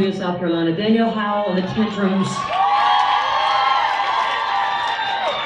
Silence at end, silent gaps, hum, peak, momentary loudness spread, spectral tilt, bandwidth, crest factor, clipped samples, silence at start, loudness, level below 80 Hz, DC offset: 0 s; none; none; -6 dBFS; 5 LU; -5 dB/octave; 10.5 kHz; 14 dB; under 0.1%; 0 s; -18 LUFS; -56 dBFS; under 0.1%